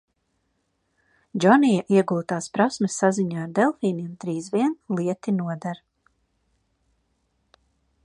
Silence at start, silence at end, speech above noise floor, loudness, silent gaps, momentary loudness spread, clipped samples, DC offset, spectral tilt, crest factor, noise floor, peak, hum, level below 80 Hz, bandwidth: 1.35 s; 2.3 s; 50 dB; -23 LUFS; none; 13 LU; under 0.1%; under 0.1%; -6 dB/octave; 22 dB; -72 dBFS; -2 dBFS; none; -70 dBFS; 11.5 kHz